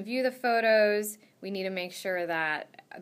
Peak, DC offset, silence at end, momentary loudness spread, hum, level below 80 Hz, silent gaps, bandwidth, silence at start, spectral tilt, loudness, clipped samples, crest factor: -14 dBFS; under 0.1%; 0 s; 15 LU; none; under -90 dBFS; none; 15.5 kHz; 0 s; -3.5 dB/octave; -28 LUFS; under 0.1%; 16 dB